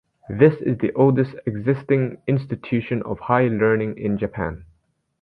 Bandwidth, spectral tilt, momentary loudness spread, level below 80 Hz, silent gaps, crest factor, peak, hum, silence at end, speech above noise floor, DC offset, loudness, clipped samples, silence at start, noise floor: 4.9 kHz; -11 dB/octave; 9 LU; -48 dBFS; none; 18 dB; -2 dBFS; none; 0.55 s; 45 dB; under 0.1%; -21 LUFS; under 0.1%; 0.3 s; -65 dBFS